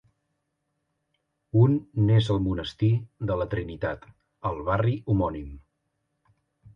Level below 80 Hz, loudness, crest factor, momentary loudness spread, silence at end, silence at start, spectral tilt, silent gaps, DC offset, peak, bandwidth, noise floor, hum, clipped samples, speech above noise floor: -46 dBFS; -26 LUFS; 18 dB; 11 LU; 1.15 s; 1.55 s; -8.5 dB/octave; none; under 0.1%; -8 dBFS; 7 kHz; -78 dBFS; none; under 0.1%; 54 dB